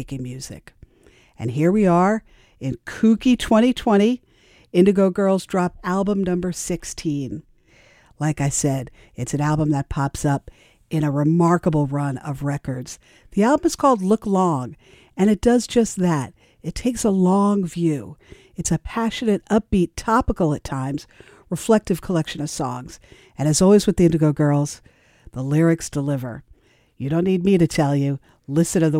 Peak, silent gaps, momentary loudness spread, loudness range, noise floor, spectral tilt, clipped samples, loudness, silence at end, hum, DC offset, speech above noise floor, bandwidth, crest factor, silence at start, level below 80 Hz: -2 dBFS; none; 15 LU; 5 LU; -54 dBFS; -6 dB/octave; under 0.1%; -20 LUFS; 0 s; none; under 0.1%; 34 dB; 16 kHz; 18 dB; 0 s; -42 dBFS